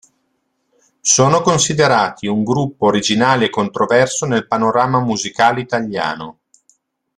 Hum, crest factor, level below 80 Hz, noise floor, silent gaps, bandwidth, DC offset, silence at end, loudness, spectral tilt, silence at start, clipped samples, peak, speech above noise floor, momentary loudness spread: none; 16 dB; -54 dBFS; -67 dBFS; none; 12 kHz; under 0.1%; 0.85 s; -15 LUFS; -4 dB/octave; 1.05 s; under 0.1%; 0 dBFS; 52 dB; 8 LU